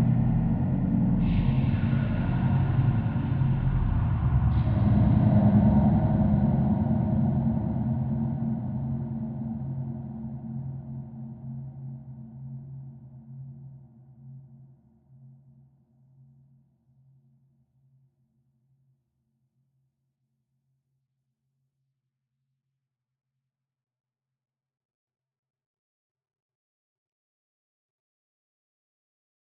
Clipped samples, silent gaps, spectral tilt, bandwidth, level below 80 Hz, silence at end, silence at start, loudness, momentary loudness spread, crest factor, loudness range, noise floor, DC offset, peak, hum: under 0.1%; none; -10 dB/octave; 4.2 kHz; -40 dBFS; 14.2 s; 0 s; -25 LUFS; 20 LU; 18 dB; 20 LU; -86 dBFS; under 0.1%; -10 dBFS; none